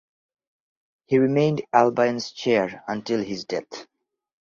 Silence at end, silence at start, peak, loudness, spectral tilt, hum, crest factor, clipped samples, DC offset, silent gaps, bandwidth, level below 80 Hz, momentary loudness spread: 0.6 s; 1.1 s; -2 dBFS; -23 LUFS; -6 dB/octave; none; 22 dB; under 0.1%; under 0.1%; none; 7.6 kHz; -66 dBFS; 12 LU